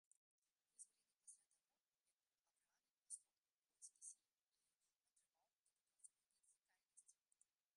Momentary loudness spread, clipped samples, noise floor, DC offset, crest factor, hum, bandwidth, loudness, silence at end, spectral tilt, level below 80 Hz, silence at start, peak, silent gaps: 8 LU; under 0.1%; under -90 dBFS; under 0.1%; 30 dB; none; 11 kHz; -63 LUFS; 0.65 s; 3 dB/octave; under -90 dBFS; 0.75 s; -42 dBFS; 1.80-1.84 s, 2.14-2.18 s, 2.41-2.45 s, 2.91-3.02 s, 3.52-3.62 s, 4.32-4.36 s, 4.42-4.47 s, 5.53-5.66 s